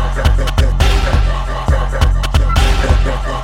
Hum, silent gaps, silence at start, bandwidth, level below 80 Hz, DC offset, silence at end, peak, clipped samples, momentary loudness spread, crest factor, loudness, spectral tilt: none; none; 0 s; 13.5 kHz; -14 dBFS; under 0.1%; 0 s; 0 dBFS; under 0.1%; 4 LU; 12 dB; -15 LUFS; -5.5 dB/octave